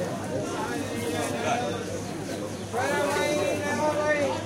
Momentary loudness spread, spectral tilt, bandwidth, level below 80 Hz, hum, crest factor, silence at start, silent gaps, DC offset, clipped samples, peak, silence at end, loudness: 8 LU; -4.5 dB/octave; 16.5 kHz; -58 dBFS; none; 14 dB; 0 s; none; under 0.1%; under 0.1%; -14 dBFS; 0 s; -28 LUFS